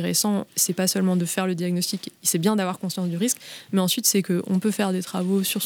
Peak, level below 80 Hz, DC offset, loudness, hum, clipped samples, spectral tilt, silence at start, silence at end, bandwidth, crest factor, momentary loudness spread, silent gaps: -6 dBFS; -74 dBFS; under 0.1%; -23 LUFS; none; under 0.1%; -4 dB/octave; 0 s; 0 s; 19.5 kHz; 18 dB; 7 LU; none